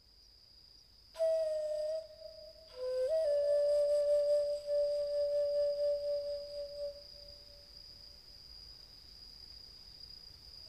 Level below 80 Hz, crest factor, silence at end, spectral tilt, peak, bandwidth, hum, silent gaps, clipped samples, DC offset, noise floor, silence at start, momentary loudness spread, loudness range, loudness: -66 dBFS; 12 dB; 0 s; -3 dB/octave; -24 dBFS; 12.5 kHz; none; none; under 0.1%; under 0.1%; -62 dBFS; 1.15 s; 21 LU; 18 LU; -34 LUFS